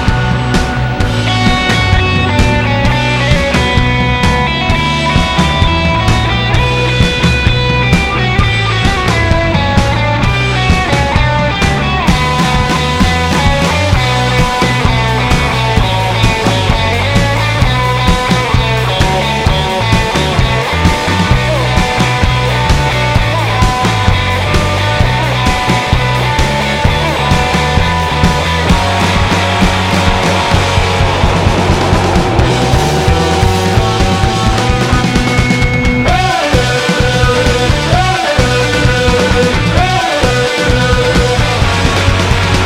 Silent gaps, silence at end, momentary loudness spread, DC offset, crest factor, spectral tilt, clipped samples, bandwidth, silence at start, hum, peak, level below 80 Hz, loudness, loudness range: none; 0 s; 1 LU; under 0.1%; 10 dB; -5 dB/octave; under 0.1%; 16 kHz; 0 s; none; 0 dBFS; -18 dBFS; -11 LUFS; 1 LU